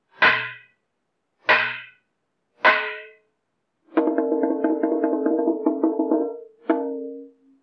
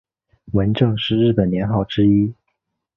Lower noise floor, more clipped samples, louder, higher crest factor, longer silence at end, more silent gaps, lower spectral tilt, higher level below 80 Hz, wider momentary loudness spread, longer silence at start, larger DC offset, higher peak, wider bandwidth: about the same, -76 dBFS vs -74 dBFS; neither; second, -22 LUFS vs -18 LUFS; about the same, 18 dB vs 16 dB; second, 0.35 s vs 0.65 s; neither; second, -5.5 dB/octave vs -9.5 dB/octave; second, under -90 dBFS vs -42 dBFS; first, 15 LU vs 5 LU; second, 0.2 s vs 0.5 s; neither; second, -6 dBFS vs -2 dBFS; about the same, 6.2 kHz vs 5.8 kHz